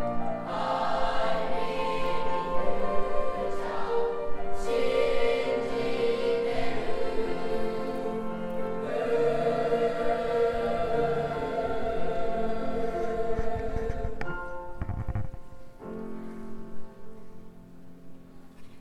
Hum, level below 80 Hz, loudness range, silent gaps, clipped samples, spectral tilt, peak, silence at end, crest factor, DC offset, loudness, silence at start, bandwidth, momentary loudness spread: none; -40 dBFS; 11 LU; none; under 0.1%; -6 dB/octave; -10 dBFS; 0 s; 16 dB; under 0.1%; -30 LUFS; 0 s; 10 kHz; 13 LU